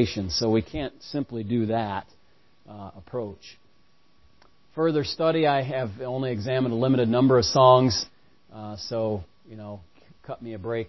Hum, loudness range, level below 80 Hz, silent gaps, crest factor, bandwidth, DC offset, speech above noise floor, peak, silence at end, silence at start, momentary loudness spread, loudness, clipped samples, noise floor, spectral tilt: none; 11 LU; -50 dBFS; none; 22 dB; 6.2 kHz; 0.2%; 40 dB; -4 dBFS; 0 s; 0 s; 21 LU; -24 LUFS; under 0.1%; -65 dBFS; -6 dB/octave